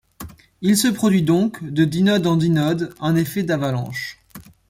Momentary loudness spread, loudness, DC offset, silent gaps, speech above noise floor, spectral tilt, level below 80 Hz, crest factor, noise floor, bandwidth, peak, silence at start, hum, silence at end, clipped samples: 13 LU; -19 LUFS; under 0.1%; none; 21 dB; -5.5 dB/octave; -52 dBFS; 14 dB; -39 dBFS; 16.5 kHz; -4 dBFS; 0.2 s; none; 0.3 s; under 0.1%